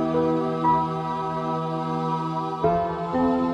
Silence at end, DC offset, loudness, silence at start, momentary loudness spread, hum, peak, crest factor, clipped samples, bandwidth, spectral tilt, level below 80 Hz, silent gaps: 0 s; under 0.1%; -25 LUFS; 0 s; 5 LU; none; -10 dBFS; 14 dB; under 0.1%; 9 kHz; -8.5 dB/octave; -50 dBFS; none